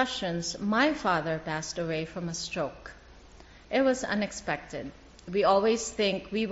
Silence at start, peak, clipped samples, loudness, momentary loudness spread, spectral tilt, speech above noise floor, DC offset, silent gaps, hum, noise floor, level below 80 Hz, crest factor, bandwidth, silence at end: 0 s; -12 dBFS; under 0.1%; -29 LUFS; 13 LU; -3.5 dB/octave; 23 dB; under 0.1%; none; none; -52 dBFS; -54 dBFS; 18 dB; 8 kHz; 0 s